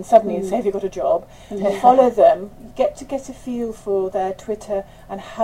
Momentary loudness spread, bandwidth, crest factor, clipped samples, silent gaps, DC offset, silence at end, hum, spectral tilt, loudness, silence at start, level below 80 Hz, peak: 16 LU; 14.5 kHz; 20 dB; under 0.1%; none; under 0.1%; 0 s; none; -6 dB/octave; -19 LUFS; 0 s; -48 dBFS; 0 dBFS